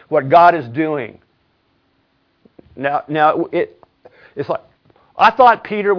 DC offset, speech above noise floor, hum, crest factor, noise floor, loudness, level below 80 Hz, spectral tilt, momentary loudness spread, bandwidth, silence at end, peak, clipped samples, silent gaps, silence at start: under 0.1%; 47 dB; none; 16 dB; -62 dBFS; -15 LUFS; -58 dBFS; -7 dB/octave; 17 LU; 5.4 kHz; 0 s; 0 dBFS; under 0.1%; none; 0.1 s